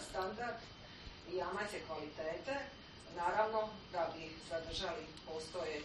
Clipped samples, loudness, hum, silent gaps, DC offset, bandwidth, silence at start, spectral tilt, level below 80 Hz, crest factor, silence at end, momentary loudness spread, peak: under 0.1%; -42 LUFS; none; none; under 0.1%; 9.4 kHz; 0 s; -4 dB/octave; -62 dBFS; 20 dB; 0 s; 13 LU; -22 dBFS